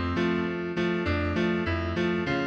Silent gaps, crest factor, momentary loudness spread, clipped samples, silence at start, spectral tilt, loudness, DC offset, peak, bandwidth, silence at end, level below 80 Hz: none; 12 dB; 2 LU; under 0.1%; 0 s; -7 dB/octave; -27 LUFS; under 0.1%; -14 dBFS; 7.8 kHz; 0 s; -44 dBFS